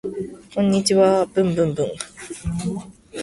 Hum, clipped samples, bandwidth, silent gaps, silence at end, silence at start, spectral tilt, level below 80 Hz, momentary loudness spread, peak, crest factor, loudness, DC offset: none; under 0.1%; 12 kHz; none; 0 s; 0.05 s; -5.5 dB/octave; -46 dBFS; 16 LU; -4 dBFS; 16 dB; -20 LUFS; under 0.1%